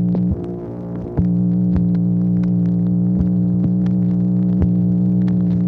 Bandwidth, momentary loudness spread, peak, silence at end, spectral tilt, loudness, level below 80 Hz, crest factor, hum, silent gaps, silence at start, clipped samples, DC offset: 2.2 kHz; 7 LU; -4 dBFS; 0 s; -12.5 dB/octave; -17 LUFS; -34 dBFS; 14 dB; 60 Hz at -25 dBFS; none; 0 s; under 0.1%; under 0.1%